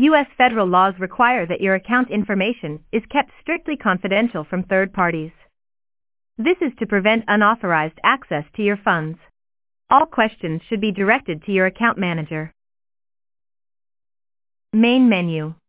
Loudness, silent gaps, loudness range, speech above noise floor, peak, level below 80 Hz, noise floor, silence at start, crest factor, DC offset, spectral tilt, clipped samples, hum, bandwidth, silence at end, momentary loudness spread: -19 LUFS; none; 3 LU; over 71 dB; 0 dBFS; -56 dBFS; under -90 dBFS; 0 s; 20 dB; under 0.1%; -9.5 dB/octave; under 0.1%; none; 4 kHz; 0.15 s; 9 LU